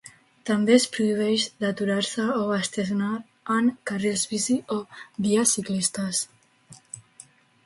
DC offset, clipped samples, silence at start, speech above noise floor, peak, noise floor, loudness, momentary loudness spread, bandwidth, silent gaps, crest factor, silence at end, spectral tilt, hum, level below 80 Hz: under 0.1%; under 0.1%; 0.05 s; 28 dB; -6 dBFS; -52 dBFS; -24 LUFS; 15 LU; 12 kHz; none; 20 dB; 0.65 s; -3.5 dB/octave; none; -68 dBFS